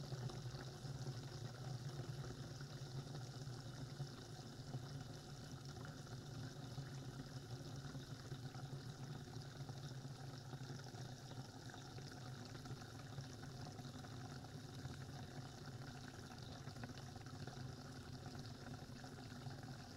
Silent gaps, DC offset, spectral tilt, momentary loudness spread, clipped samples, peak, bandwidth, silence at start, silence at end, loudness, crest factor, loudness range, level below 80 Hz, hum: none; under 0.1%; -5.5 dB/octave; 4 LU; under 0.1%; -36 dBFS; 16 kHz; 0 s; 0 s; -53 LUFS; 16 dB; 2 LU; -68 dBFS; none